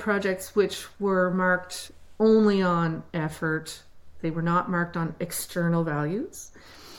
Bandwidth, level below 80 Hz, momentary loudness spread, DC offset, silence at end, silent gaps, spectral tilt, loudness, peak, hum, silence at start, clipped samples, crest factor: 17 kHz; -56 dBFS; 16 LU; under 0.1%; 0 s; none; -6 dB/octave; -26 LUFS; -10 dBFS; none; 0 s; under 0.1%; 16 dB